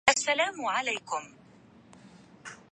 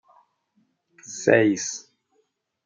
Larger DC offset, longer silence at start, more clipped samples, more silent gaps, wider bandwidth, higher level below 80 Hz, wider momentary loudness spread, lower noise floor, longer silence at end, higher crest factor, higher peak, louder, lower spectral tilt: neither; second, 0.05 s vs 1.1 s; neither; neither; first, 11.5 kHz vs 9.4 kHz; about the same, -70 dBFS vs -74 dBFS; first, 22 LU vs 19 LU; second, -56 dBFS vs -71 dBFS; second, 0.15 s vs 0.85 s; about the same, 28 dB vs 24 dB; about the same, -4 dBFS vs -2 dBFS; second, -29 LUFS vs -21 LUFS; second, -0.5 dB/octave vs -4.5 dB/octave